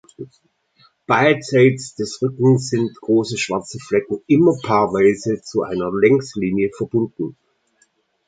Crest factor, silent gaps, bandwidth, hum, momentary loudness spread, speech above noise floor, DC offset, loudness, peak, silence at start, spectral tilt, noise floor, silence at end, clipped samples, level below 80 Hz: 18 dB; none; 9.4 kHz; none; 11 LU; 45 dB; under 0.1%; -18 LUFS; -2 dBFS; 0.2 s; -6 dB/octave; -62 dBFS; 0.95 s; under 0.1%; -56 dBFS